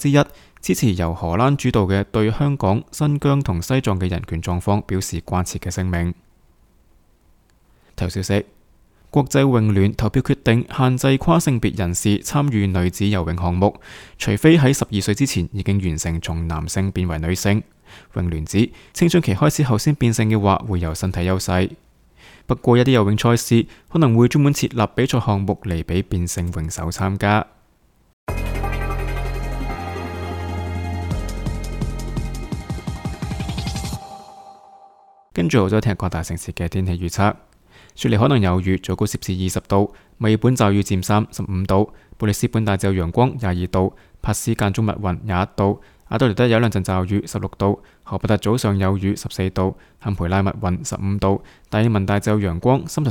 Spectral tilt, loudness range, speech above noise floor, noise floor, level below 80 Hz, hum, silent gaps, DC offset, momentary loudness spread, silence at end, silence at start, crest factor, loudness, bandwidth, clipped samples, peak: -6 dB/octave; 9 LU; 39 dB; -57 dBFS; -36 dBFS; none; 28.13-28.27 s; under 0.1%; 11 LU; 0 s; 0 s; 20 dB; -20 LUFS; 18 kHz; under 0.1%; 0 dBFS